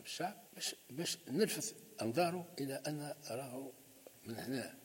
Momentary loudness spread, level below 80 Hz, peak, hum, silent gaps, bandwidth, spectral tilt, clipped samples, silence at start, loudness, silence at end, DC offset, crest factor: 13 LU; -84 dBFS; -20 dBFS; none; none; 16.5 kHz; -4 dB/octave; under 0.1%; 0 s; -41 LUFS; 0 s; under 0.1%; 20 dB